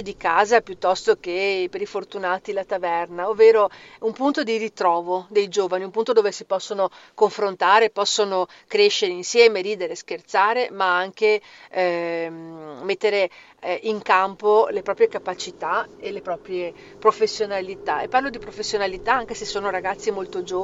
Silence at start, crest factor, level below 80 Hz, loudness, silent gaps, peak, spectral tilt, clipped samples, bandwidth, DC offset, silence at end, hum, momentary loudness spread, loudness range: 0 s; 20 dB; -58 dBFS; -22 LUFS; none; -2 dBFS; -3 dB/octave; under 0.1%; 8 kHz; under 0.1%; 0 s; none; 12 LU; 5 LU